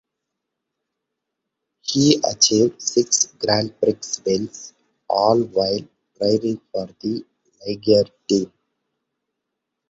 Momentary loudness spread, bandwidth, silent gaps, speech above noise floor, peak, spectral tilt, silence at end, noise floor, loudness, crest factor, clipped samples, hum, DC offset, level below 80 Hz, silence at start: 14 LU; 8.2 kHz; none; 61 dB; -2 dBFS; -3.5 dB/octave; 1.45 s; -81 dBFS; -20 LUFS; 20 dB; under 0.1%; none; under 0.1%; -58 dBFS; 1.85 s